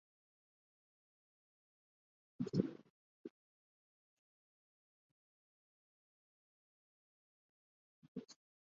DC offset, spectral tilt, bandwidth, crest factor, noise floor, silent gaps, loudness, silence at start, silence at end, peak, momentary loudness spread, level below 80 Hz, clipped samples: under 0.1%; -9 dB/octave; 6.8 kHz; 34 dB; under -90 dBFS; 2.90-3.24 s, 3.30-8.02 s, 8.08-8.15 s; -44 LUFS; 2.4 s; 0.4 s; -20 dBFS; 22 LU; -82 dBFS; under 0.1%